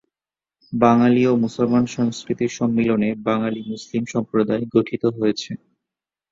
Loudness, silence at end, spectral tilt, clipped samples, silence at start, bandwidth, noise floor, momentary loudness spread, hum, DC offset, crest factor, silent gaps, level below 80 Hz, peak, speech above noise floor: -20 LUFS; 0.75 s; -6.5 dB/octave; under 0.1%; 0.7 s; 7.6 kHz; under -90 dBFS; 11 LU; none; under 0.1%; 18 dB; none; -58 dBFS; -2 dBFS; over 71 dB